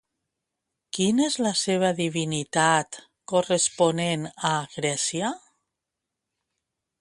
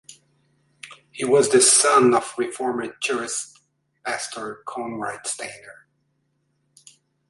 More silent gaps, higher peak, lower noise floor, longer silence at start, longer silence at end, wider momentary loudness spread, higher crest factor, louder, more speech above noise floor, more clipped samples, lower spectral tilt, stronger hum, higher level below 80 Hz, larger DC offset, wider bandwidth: neither; about the same, -6 dBFS vs -4 dBFS; first, -85 dBFS vs -70 dBFS; first, 0.95 s vs 0.1 s; about the same, 1.65 s vs 1.55 s; second, 9 LU vs 22 LU; about the same, 20 dB vs 20 dB; second, -24 LUFS vs -20 LUFS; first, 61 dB vs 49 dB; neither; first, -3.5 dB/octave vs -2 dB/octave; neither; about the same, -68 dBFS vs -70 dBFS; neither; about the same, 11.5 kHz vs 11.5 kHz